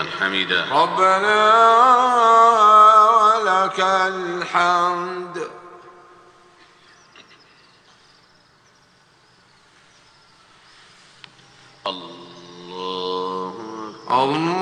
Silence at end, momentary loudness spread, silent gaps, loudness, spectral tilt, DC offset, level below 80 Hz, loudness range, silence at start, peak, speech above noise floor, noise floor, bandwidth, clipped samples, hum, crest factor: 0 s; 20 LU; none; -15 LUFS; -3.5 dB/octave; under 0.1%; -66 dBFS; 24 LU; 0 s; -2 dBFS; 39 dB; -55 dBFS; 10 kHz; under 0.1%; none; 18 dB